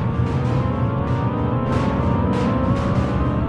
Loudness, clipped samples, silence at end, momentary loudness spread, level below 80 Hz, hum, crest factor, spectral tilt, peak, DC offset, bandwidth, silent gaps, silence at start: -20 LUFS; under 0.1%; 0 s; 2 LU; -30 dBFS; none; 12 dB; -9 dB/octave; -8 dBFS; under 0.1%; 8.6 kHz; none; 0 s